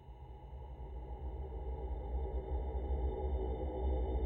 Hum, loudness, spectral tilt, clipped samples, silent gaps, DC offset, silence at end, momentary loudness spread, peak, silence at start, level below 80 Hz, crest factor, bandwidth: none; -42 LUFS; -11 dB/octave; under 0.1%; none; under 0.1%; 0 s; 13 LU; -26 dBFS; 0 s; -40 dBFS; 14 dB; 3.8 kHz